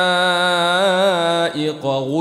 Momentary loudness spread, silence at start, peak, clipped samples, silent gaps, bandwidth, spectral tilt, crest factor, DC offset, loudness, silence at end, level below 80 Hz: 6 LU; 0 s; -4 dBFS; under 0.1%; none; 14 kHz; -4 dB/octave; 12 dB; under 0.1%; -17 LUFS; 0 s; -64 dBFS